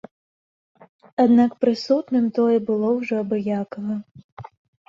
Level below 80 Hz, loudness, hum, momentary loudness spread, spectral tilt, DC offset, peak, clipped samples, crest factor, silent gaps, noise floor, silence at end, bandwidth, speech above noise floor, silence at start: -66 dBFS; -21 LUFS; none; 13 LU; -7.5 dB/octave; under 0.1%; -6 dBFS; under 0.1%; 16 dB; 4.24-4.37 s; under -90 dBFS; 0.45 s; 7.4 kHz; over 70 dB; 1.2 s